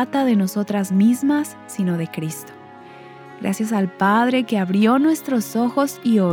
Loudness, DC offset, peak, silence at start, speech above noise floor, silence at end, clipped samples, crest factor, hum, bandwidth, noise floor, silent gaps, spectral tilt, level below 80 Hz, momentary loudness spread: -19 LUFS; under 0.1%; -4 dBFS; 0 s; 22 dB; 0 s; under 0.1%; 14 dB; none; 19 kHz; -40 dBFS; none; -6 dB/octave; -70 dBFS; 12 LU